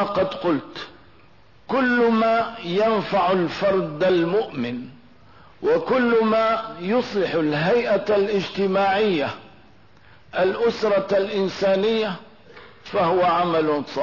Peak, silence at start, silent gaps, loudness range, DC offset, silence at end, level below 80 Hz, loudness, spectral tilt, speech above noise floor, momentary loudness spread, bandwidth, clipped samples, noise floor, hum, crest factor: -10 dBFS; 0 s; none; 2 LU; 0.3%; 0 s; -58 dBFS; -21 LUFS; -6.5 dB/octave; 33 dB; 10 LU; 6 kHz; under 0.1%; -53 dBFS; none; 12 dB